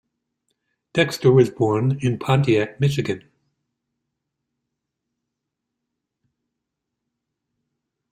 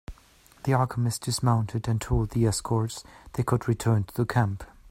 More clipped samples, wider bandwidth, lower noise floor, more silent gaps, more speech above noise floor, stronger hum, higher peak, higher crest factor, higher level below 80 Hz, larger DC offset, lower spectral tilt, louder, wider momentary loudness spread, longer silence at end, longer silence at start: neither; second, 13.5 kHz vs 16 kHz; first, -81 dBFS vs -56 dBFS; neither; first, 63 dB vs 31 dB; neither; first, -4 dBFS vs -8 dBFS; about the same, 22 dB vs 18 dB; second, -58 dBFS vs -42 dBFS; neither; about the same, -7 dB/octave vs -6 dB/octave; first, -20 LUFS vs -27 LUFS; about the same, 10 LU vs 8 LU; first, 4.95 s vs 0.25 s; first, 0.95 s vs 0.1 s